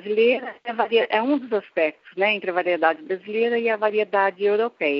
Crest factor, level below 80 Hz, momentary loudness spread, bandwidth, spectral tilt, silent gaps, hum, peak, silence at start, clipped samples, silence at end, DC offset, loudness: 18 dB; -82 dBFS; 6 LU; 5.6 kHz; -1.5 dB/octave; none; none; -4 dBFS; 0.05 s; under 0.1%; 0 s; under 0.1%; -22 LUFS